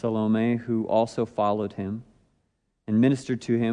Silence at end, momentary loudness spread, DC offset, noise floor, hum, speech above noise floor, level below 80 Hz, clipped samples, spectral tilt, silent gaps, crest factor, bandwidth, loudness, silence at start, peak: 0 s; 11 LU; under 0.1%; -73 dBFS; none; 49 dB; -64 dBFS; under 0.1%; -7.5 dB/octave; none; 16 dB; 10 kHz; -25 LUFS; 0.05 s; -8 dBFS